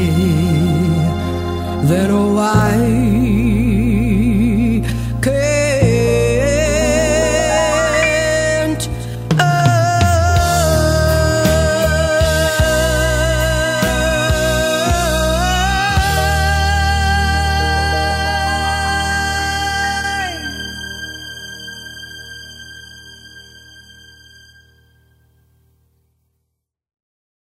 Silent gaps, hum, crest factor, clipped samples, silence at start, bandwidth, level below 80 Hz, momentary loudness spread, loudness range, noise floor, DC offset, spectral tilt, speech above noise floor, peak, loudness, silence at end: none; none; 14 dB; under 0.1%; 0 s; 16 kHz; -24 dBFS; 12 LU; 10 LU; -74 dBFS; under 0.1%; -5 dB/octave; 61 dB; 0 dBFS; -15 LUFS; 3.7 s